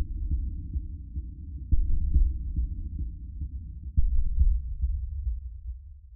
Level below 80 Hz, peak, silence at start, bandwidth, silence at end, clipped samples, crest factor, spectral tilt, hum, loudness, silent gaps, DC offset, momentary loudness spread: -28 dBFS; -10 dBFS; 0 s; 0.4 kHz; 0 s; under 0.1%; 16 dB; -17.5 dB/octave; none; -33 LUFS; none; under 0.1%; 13 LU